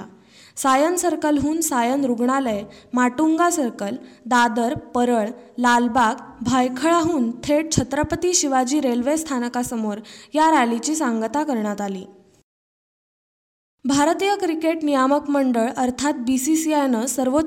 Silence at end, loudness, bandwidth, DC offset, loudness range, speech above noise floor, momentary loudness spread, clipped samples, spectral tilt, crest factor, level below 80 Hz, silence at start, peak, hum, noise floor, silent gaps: 0 s; -20 LUFS; 17 kHz; under 0.1%; 4 LU; 28 dB; 9 LU; under 0.1%; -3.5 dB/octave; 18 dB; -50 dBFS; 0 s; -4 dBFS; none; -48 dBFS; 12.44-13.78 s